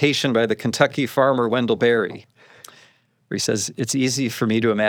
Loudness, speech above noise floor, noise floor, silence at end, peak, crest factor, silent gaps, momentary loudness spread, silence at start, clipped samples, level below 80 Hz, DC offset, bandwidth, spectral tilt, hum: -20 LUFS; 37 dB; -57 dBFS; 0 s; -2 dBFS; 20 dB; none; 6 LU; 0 s; under 0.1%; -70 dBFS; under 0.1%; over 20 kHz; -4.5 dB/octave; none